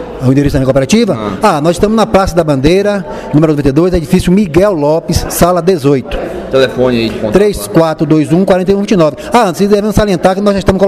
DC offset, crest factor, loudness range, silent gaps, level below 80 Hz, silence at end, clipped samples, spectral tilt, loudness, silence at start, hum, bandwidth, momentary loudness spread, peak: 0.1%; 10 dB; 1 LU; none; -26 dBFS; 0 s; 0.7%; -6 dB/octave; -10 LUFS; 0 s; none; 15.5 kHz; 3 LU; 0 dBFS